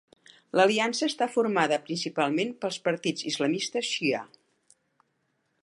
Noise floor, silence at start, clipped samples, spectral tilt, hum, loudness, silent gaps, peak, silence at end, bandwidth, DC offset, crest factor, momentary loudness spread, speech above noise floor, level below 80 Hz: -75 dBFS; 0.55 s; under 0.1%; -3.5 dB/octave; none; -27 LUFS; none; -8 dBFS; 1.4 s; 11.5 kHz; under 0.1%; 22 dB; 7 LU; 48 dB; -82 dBFS